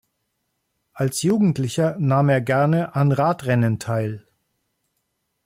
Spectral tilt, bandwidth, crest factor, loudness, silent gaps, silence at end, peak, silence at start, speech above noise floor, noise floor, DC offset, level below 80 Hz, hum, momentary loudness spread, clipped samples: -6.5 dB/octave; 16 kHz; 14 dB; -20 LUFS; none; 1.25 s; -8 dBFS; 0.95 s; 55 dB; -74 dBFS; under 0.1%; -60 dBFS; none; 7 LU; under 0.1%